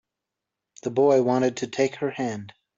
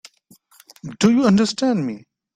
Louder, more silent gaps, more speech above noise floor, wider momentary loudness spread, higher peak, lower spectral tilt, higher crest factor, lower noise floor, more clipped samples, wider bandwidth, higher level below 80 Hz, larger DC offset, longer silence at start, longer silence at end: second, -24 LUFS vs -18 LUFS; neither; first, 63 dB vs 37 dB; second, 12 LU vs 22 LU; second, -8 dBFS vs -2 dBFS; about the same, -5.5 dB/octave vs -5.5 dB/octave; about the same, 16 dB vs 18 dB; first, -86 dBFS vs -54 dBFS; neither; second, 7.8 kHz vs 13 kHz; second, -70 dBFS vs -58 dBFS; neither; about the same, 0.85 s vs 0.85 s; about the same, 0.3 s vs 0.35 s